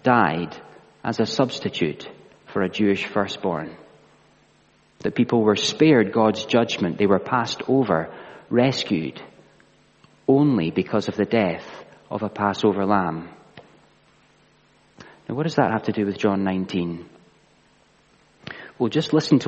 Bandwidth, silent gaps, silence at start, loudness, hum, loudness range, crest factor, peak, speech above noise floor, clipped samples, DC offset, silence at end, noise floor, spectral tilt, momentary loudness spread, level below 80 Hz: 8.4 kHz; none; 0.05 s; -22 LUFS; none; 6 LU; 20 dB; -2 dBFS; 37 dB; under 0.1%; under 0.1%; 0 s; -58 dBFS; -6 dB/octave; 18 LU; -62 dBFS